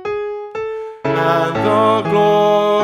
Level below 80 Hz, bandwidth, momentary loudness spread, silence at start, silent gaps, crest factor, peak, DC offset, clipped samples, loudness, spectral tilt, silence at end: -54 dBFS; 14 kHz; 12 LU; 0 s; none; 14 dB; -2 dBFS; under 0.1%; under 0.1%; -16 LUFS; -6.5 dB/octave; 0 s